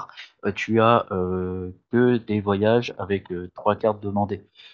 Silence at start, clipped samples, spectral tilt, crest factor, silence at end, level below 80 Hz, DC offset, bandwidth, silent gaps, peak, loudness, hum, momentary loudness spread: 0 s; under 0.1%; -7.5 dB/octave; 20 dB; 0.05 s; -64 dBFS; under 0.1%; 7.2 kHz; none; -4 dBFS; -23 LUFS; none; 11 LU